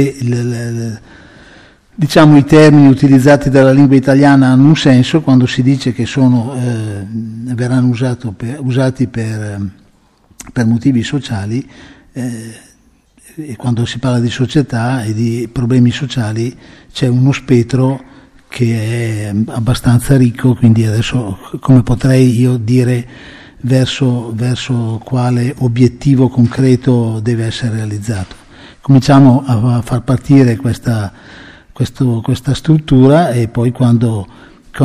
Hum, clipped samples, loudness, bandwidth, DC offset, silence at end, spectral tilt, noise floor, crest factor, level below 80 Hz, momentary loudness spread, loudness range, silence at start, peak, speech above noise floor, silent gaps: none; under 0.1%; -12 LUFS; 13 kHz; under 0.1%; 0 s; -7.5 dB/octave; -49 dBFS; 12 dB; -36 dBFS; 15 LU; 9 LU; 0 s; 0 dBFS; 38 dB; none